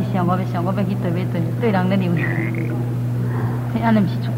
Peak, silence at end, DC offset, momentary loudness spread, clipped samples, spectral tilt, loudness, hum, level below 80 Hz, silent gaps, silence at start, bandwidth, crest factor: -4 dBFS; 0 s; under 0.1%; 5 LU; under 0.1%; -8.5 dB/octave; -20 LUFS; 60 Hz at -40 dBFS; -48 dBFS; none; 0 s; 15.5 kHz; 14 dB